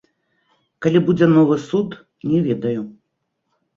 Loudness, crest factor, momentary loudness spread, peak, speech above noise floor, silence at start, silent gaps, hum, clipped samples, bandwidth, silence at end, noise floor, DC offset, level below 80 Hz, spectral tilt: -18 LUFS; 18 dB; 15 LU; -2 dBFS; 57 dB; 0.8 s; none; none; under 0.1%; 7.4 kHz; 0.85 s; -74 dBFS; under 0.1%; -58 dBFS; -8.5 dB/octave